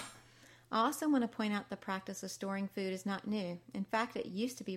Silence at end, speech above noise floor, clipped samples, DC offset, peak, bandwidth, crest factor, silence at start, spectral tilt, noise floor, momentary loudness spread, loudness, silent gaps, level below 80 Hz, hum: 0 s; 25 dB; under 0.1%; under 0.1%; -20 dBFS; 16 kHz; 18 dB; 0 s; -5 dB/octave; -61 dBFS; 9 LU; -37 LUFS; none; -78 dBFS; none